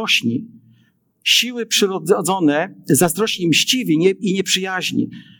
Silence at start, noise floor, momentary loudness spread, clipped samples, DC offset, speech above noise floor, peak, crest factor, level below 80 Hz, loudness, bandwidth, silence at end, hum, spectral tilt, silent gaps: 0 s; -58 dBFS; 7 LU; under 0.1%; under 0.1%; 41 dB; -2 dBFS; 16 dB; -68 dBFS; -17 LUFS; 19 kHz; 0.2 s; none; -3 dB/octave; none